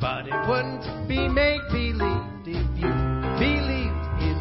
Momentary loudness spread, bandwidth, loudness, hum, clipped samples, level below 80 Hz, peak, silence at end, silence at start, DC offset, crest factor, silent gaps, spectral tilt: 7 LU; 5.8 kHz; -25 LUFS; none; under 0.1%; -30 dBFS; -8 dBFS; 0 s; 0 s; 0.1%; 16 dB; none; -11 dB/octave